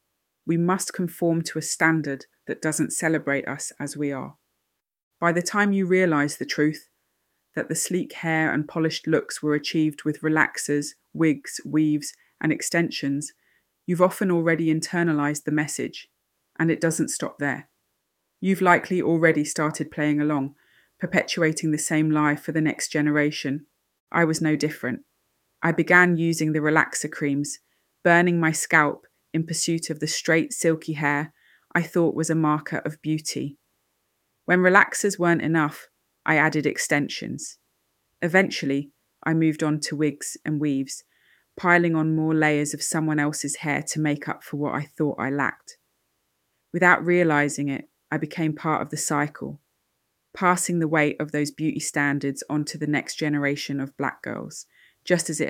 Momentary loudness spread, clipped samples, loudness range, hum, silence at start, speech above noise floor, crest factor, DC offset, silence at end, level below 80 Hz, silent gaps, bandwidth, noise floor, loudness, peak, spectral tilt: 12 LU; under 0.1%; 4 LU; none; 0.45 s; 55 dB; 22 dB; under 0.1%; 0 s; -70 dBFS; 5.03-5.11 s, 24.00-24.07 s; 16.5 kHz; -79 dBFS; -23 LUFS; -2 dBFS; -5 dB/octave